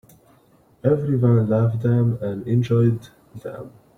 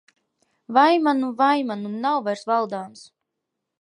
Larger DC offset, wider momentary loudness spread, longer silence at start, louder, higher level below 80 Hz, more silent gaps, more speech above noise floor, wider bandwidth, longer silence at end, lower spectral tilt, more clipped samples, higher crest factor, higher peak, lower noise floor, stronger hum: neither; first, 17 LU vs 12 LU; first, 0.85 s vs 0.7 s; about the same, -20 LUFS vs -21 LUFS; first, -54 dBFS vs -80 dBFS; neither; second, 36 dB vs 60 dB; second, 6.2 kHz vs 11 kHz; second, 0.3 s vs 0.75 s; first, -10 dB/octave vs -5.5 dB/octave; neither; about the same, 16 dB vs 20 dB; about the same, -4 dBFS vs -2 dBFS; second, -56 dBFS vs -81 dBFS; neither